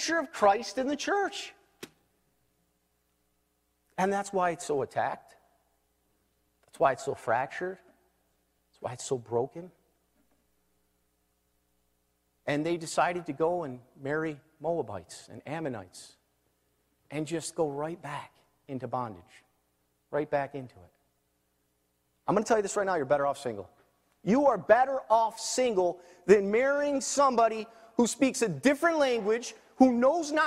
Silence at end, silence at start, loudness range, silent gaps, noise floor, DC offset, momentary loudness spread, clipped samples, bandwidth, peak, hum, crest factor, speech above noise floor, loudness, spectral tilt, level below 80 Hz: 0 s; 0 s; 12 LU; none; -75 dBFS; under 0.1%; 17 LU; under 0.1%; 15.5 kHz; -8 dBFS; 60 Hz at -70 dBFS; 24 dB; 46 dB; -29 LUFS; -4.5 dB/octave; -70 dBFS